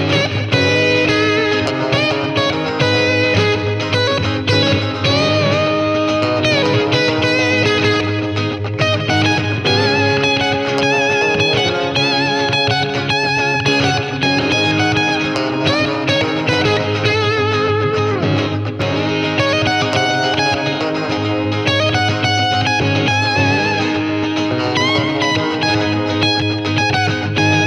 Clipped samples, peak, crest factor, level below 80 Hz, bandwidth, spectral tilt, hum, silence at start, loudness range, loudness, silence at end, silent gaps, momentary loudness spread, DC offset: under 0.1%; -2 dBFS; 14 dB; -46 dBFS; 11.5 kHz; -5 dB/octave; none; 0 s; 2 LU; -15 LUFS; 0 s; none; 4 LU; under 0.1%